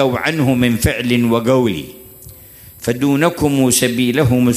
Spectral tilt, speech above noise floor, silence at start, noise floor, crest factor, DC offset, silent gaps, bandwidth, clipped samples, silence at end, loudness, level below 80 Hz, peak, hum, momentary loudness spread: -5 dB/octave; 25 dB; 0 s; -40 dBFS; 14 dB; under 0.1%; none; 15.5 kHz; under 0.1%; 0 s; -15 LUFS; -38 dBFS; -2 dBFS; none; 8 LU